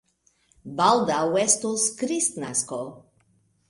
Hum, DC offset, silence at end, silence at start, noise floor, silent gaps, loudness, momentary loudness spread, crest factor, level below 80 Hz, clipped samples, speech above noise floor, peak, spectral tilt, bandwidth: none; under 0.1%; 0.7 s; 0.65 s; -65 dBFS; none; -23 LUFS; 13 LU; 22 dB; -66 dBFS; under 0.1%; 41 dB; -4 dBFS; -2.5 dB/octave; 11.5 kHz